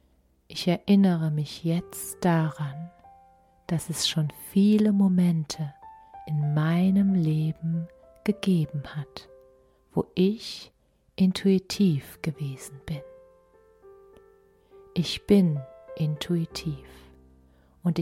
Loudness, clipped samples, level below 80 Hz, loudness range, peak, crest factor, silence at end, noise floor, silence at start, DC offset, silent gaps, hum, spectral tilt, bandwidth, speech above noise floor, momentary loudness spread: -26 LUFS; under 0.1%; -58 dBFS; 5 LU; -8 dBFS; 18 dB; 0 s; -64 dBFS; 0.5 s; under 0.1%; none; none; -6.5 dB/octave; 15.5 kHz; 39 dB; 16 LU